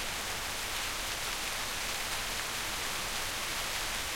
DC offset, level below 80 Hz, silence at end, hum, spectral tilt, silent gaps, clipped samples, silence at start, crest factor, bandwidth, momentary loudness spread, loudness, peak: under 0.1%; -48 dBFS; 0 s; none; -0.5 dB/octave; none; under 0.1%; 0 s; 16 dB; 16.5 kHz; 1 LU; -33 LUFS; -18 dBFS